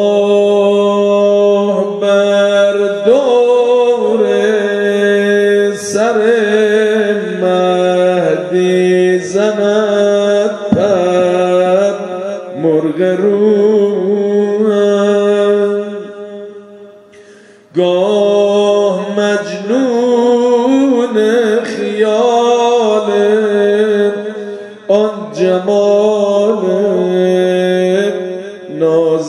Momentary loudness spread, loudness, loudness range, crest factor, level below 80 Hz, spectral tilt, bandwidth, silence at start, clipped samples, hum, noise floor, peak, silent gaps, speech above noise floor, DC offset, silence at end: 6 LU; -12 LUFS; 3 LU; 12 dB; -60 dBFS; -5.5 dB/octave; 11 kHz; 0 s; under 0.1%; none; -40 dBFS; 0 dBFS; none; 31 dB; under 0.1%; 0 s